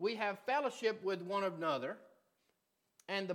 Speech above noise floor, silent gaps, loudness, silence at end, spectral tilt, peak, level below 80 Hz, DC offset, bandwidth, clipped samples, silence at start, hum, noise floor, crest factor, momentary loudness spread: 44 dB; none; -38 LUFS; 0 s; -4.5 dB/octave; -22 dBFS; under -90 dBFS; under 0.1%; 17.5 kHz; under 0.1%; 0 s; none; -82 dBFS; 18 dB; 9 LU